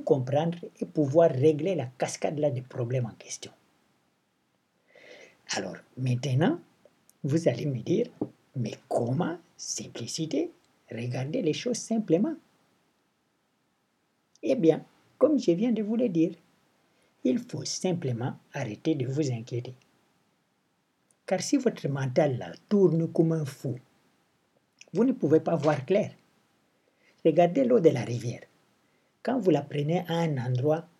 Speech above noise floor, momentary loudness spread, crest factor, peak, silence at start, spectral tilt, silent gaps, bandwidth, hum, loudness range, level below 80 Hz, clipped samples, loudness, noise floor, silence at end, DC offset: 46 dB; 13 LU; 22 dB; -8 dBFS; 0 s; -6.5 dB/octave; none; 13 kHz; none; 6 LU; -82 dBFS; under 0.1%; -28 LUFS; -73 dBFS; 0.15 s; under 0.1%